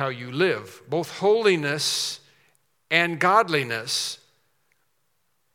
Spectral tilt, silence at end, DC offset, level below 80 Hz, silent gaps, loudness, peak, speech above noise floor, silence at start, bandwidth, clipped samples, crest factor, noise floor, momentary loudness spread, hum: -3.5 dB/octave; 1.4 s; under 0.1%; -80 dBFS; none; -23 LUFS; -4 dBFS; 50 dB; 0 s; 16.5 kHz; under 0.1%; 22 dB; -73 dBFS; 11 LU; none